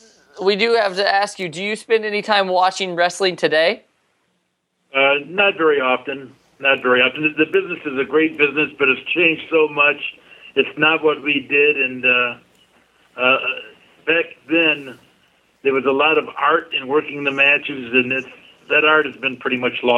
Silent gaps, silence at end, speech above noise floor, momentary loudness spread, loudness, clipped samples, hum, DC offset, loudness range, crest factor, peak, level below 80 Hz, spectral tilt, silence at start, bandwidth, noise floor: none; 0 s; 52 dB; 9 LU; -17 LUFS; under 0.1%; none; under 0.1%; 3 LU; 18 dB; 0 dBFS; -72 dBFS; -4 dB/octave; 0.35 s; 11.5 kHz; -70 dBFS